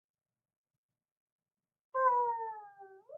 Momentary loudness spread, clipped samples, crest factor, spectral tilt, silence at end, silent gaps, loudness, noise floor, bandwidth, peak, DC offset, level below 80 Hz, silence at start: 15 LU; under 0.1%; 20 dB; -2.5 dB/octave; 0 s; none; -33 LUFS; -55 dBFS; 2.6 kHz; -18 dBFS; under 0.1%; under -90 dBFS; 1.95 s